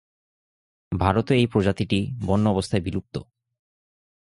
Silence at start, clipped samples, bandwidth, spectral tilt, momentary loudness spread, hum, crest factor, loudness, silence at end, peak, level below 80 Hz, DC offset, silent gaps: 0.9 s; under 0.1%; 11.5 kHz; -7 dB/octave; 12 LU; none; 22 dB; -23 LUFS; 1.1 s; -4 dBFS; -42 dBFS; under 0.1%; none